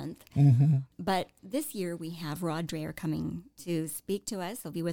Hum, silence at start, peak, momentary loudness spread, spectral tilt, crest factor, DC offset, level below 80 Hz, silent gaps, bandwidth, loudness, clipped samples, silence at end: none; 0 s; -14 dBFS; 13 LU; -6.5 dB/octave; 16 dB; under 0.1%; -60 dBFS; none; 18.5 kHz; -31 LUFS; under 0.1%; 0 s